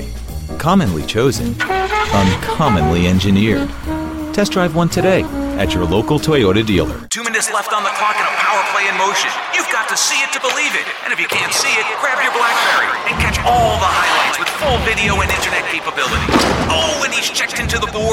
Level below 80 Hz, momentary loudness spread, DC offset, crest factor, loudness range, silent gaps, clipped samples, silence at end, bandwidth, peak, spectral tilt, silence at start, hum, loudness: -30 dBFS; 5 LU; under 0.1%; 14 dB; 2 LU; none; under 0.1%; 0 s; 16.5 kHz; -2 dBFS; -4 dB/octave; 0 s; none; -15 LUFS